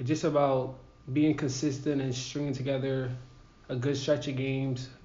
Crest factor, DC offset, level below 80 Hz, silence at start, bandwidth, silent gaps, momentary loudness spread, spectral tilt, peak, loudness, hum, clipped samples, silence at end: 16 dB; under 0.1%; -58 dBFS; 0 s; 7.4 kHz; none; 10 LU; -6.5 dB/octave; -14 dBFS; -30 LUFS; none; under 0.1%; 0 s